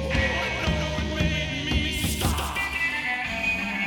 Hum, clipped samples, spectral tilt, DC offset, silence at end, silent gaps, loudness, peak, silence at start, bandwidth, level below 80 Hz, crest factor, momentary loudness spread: none; under 0.1%; -4 dB/octave; under 0.1%; 0 s; none; -25 LUFS; -10 dBFS; 0 s; 19 kHz; -34 dBFS; 16 dB; 2 LU